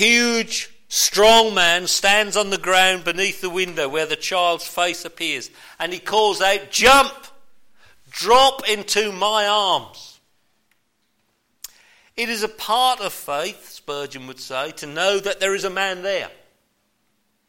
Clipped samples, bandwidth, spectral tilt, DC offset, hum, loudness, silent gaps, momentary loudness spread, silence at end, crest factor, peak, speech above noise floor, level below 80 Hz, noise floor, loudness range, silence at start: under 0.1%; 16.5 kHz; -1 dB/octave; under 0.1%; none; -18 LUFS; none; 16 LU; 1.2 s; 16 dB; -4 dBFS; 50 dB; -50 dBFS; -69 dBFS; 8 LU; 0 s